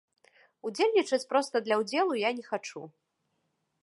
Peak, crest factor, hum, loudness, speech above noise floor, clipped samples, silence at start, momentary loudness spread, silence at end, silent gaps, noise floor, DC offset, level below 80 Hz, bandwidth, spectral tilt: -12 dBFS; 20 dB; none; -29 LUFS; 49 dB; under 0.1%; 0.65 s; 14 LU; 0.95 s; none; -78 dBFS; under 0.1%; -88 dBFS; 11.5 kHz; -3.5 dB/octave